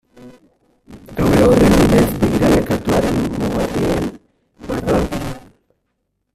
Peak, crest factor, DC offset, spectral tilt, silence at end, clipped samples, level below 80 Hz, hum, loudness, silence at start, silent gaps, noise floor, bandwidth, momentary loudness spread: 0 dBFS; 16 dB; under 0.1%; -6.5 dB/octave; 0.95 s; under 0.1%; -32 dBFS; none; -16 LUFS; 0.2 s; none; -71 dBFS; 15.5 kHz; 15 LU